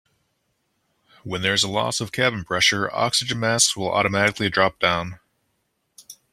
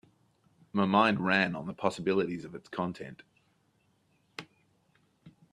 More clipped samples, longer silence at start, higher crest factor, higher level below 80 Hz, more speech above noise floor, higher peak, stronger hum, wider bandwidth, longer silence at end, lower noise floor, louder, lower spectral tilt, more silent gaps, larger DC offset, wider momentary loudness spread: neither; first, 1.25 s vs 0.75 s; about the same, 22 dB vs 24 dB; first, -56 dBFS vs -70 dBFS; first, 51 dB vs 41 dB; first, -2 dBFS vs -10 dBFS; neither; first, 16 kHz vs 11 kHz; about the same, 0.2 s vs 0.25 s; about the same, -72 dBFS vs -71 dBFS; first, -20 LUFS vs -30 LUFS; second, -2.5 dB/octave vs -6 dB/octave; neither; neither; second, 7 LU vs 22 LU